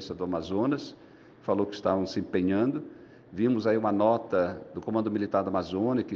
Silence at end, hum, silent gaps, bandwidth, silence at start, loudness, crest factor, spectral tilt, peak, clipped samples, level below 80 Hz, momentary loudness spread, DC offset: 0 s; none; none; 7.2 kHz; 0 s; -28 LUFS; 18 dB; -7.5 dB/octave; -10 dBFS; under 0.1%; -64 dBFS; 11 LU; under 0.1%